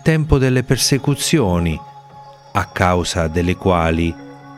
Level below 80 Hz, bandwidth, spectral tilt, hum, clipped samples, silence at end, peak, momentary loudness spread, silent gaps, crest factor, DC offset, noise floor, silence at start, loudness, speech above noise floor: -34 dBFS; 16 kHz; -5 dB/octave; none; under 0.1%; 0 s; 0 dBFS; 8 LU; none; 16 dB; under 0.1%; -40 dBFS; 0 s; -17 LUFS; 24 dB